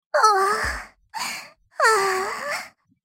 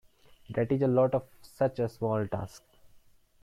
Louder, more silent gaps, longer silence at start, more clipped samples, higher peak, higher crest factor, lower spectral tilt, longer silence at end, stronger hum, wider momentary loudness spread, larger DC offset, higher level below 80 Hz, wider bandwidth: first, -22 LUFS vs -30 LUFS; neither; second, 0.15 s vs 0.5 s; neither; first, -4 dBFS vs -14 dBFS; about the same, 20 dB vs 16 dB; second, -1.5 dB/octave vs -8.5 dB/octave; second, 0.35 s vs 0.55 s; neither; first, 18 LU vs 11 LU; neither; first, -48 dBFS vs -60 dBFS; first, 17 kHz vs 14.5 kHz